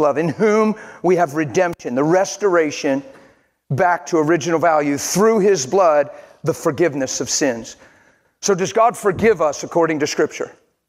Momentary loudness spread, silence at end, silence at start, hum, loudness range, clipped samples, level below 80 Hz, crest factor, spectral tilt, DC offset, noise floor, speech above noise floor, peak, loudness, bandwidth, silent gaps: 8 LU; 0.35 s; 0 s; none; 2 LU; under 0.1%; -58 dBFS; 14 dB; -4.5 dB/octave; under 0.1%; -55 dBFS; 38 dB; -2 dBFS; -18 LUFS; 16 kHz; none